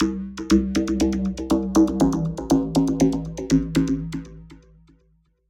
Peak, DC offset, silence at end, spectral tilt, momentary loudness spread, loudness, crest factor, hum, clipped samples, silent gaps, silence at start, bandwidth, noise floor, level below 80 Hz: -6 dBFS; under 0.1%; 0.95 s; -6.5 dB/octave; 9 LU; -22 LUFS; 16 dB; none; under 0.1%; none; 0 s; 16.5 kHz; -62 dBFS; -36 dBFS